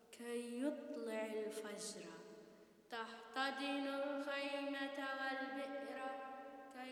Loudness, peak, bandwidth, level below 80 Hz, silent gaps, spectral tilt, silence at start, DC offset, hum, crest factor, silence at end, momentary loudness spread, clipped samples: -45 LUFS; -28 dBFS; 19 kHz; under -90 dBFS; none; -2.5 dB/octave; 0 s; under 0.1%; none; 18 dB; 0 s; 12 LU; under 0.1%